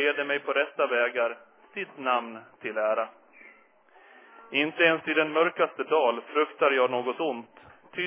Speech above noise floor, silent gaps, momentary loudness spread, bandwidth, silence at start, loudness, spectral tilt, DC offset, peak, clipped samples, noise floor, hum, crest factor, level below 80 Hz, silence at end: 32 dB; none; 14 LU; 3.7 kHz; 0 s; -26 LUFS; -7.5 dB/octave; under 0.1%; -8 dBFS; under 0.1%; -59 dBFS; none; 20 dB; -82 dBFS; 0 s